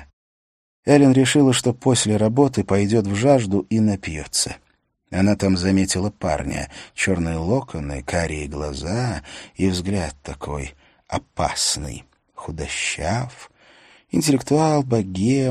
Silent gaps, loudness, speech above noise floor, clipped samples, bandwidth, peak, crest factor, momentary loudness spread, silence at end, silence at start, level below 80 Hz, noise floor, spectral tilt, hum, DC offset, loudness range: 0.13-0.83 s; -20 LUFS; 45 dB; under 0.1%; 13 kHz; -2 dBFS; 20 dB; 14 LU; 0 s; 0 s; -40 dBFS; -65 dBFS; -5 dB/octave; none; under 0.1%; 8 LU